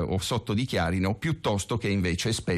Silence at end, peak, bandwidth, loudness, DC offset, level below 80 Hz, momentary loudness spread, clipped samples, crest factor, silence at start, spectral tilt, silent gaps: 0 s; -16 dBFS; 13.5 kHz; -27 LUFS; under 0.1%; -50 dBFS; 2 LU; under 0.1%; 10 dB; 0 s; -5 dB/octave; none